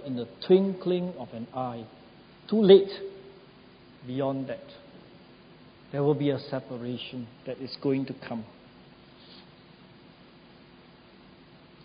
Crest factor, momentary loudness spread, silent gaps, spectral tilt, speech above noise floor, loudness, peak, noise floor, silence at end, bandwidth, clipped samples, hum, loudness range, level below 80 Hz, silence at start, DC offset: 24 dB; 27 LU; none; -11 dB/octave; 27 dB; -27 LUFS; -6 dBFS; -54 dBFS; 2.45 s; 5.2 kHz; under 0.1%; none; 12 LU; -68 dBFS; 0 s; under 0.1%